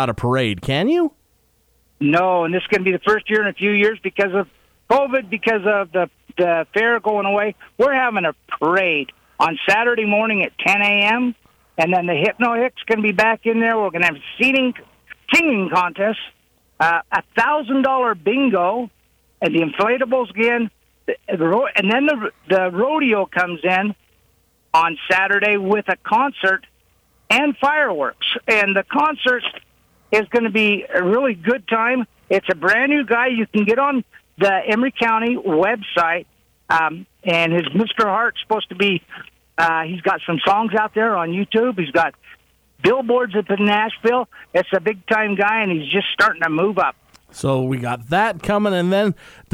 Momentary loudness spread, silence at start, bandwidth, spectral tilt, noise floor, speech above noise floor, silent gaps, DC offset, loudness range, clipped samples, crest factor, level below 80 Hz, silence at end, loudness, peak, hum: 7 LU; 0 s; 16 kHz; -5.5 dB/octave; -60 dBFS; 43 dB; none; under 0.1%; 2 LU; under 0.1%; 16 dB; -56 dBFS; 0.25 s; -18 LUFS; -4 dBFS; none